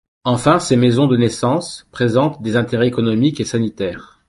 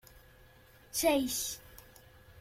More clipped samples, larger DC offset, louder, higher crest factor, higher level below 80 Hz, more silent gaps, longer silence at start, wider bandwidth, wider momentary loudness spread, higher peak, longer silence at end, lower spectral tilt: neither; neither; first, -17 LUFS vs -32 LUFS; second, 14 dB vs 20 dB; first, -48 dBFS vs -60 dBFS; neither; second, 0.25 s vs 0.95 s; second, 11.5 kHz vs 16.5 kHz; second, 8 LU vs 24 LU; first, -2 dBFS vs -16 dBFS; first, 0.25 s vs 0 s; first, -6 dB/octave vs -2 dB/octave